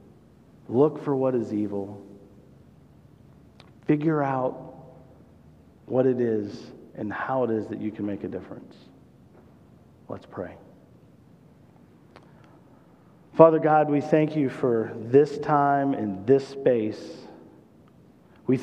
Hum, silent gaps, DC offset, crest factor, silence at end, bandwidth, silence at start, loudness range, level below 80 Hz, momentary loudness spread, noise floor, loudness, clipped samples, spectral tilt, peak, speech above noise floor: none; none; under 0.1%; 26 dB; 0 s; 8.8 kHz; 0.7 s; 22 LU; -66 dBFS; 19 LU; -54 dBFS; -24 LUFS; under 0.1%; -9 dB/octave; 0 dBFS; 30 dB